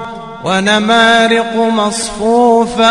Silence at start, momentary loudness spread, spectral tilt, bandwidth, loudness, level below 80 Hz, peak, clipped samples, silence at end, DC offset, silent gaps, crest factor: 0 s; 8 LU; -3.5 dB/octave; 12 kHz; -11 LUFS; -42 dBFS; 0 dBFS; under 0.1%; 0 s; under 0.1%; none; 12 dB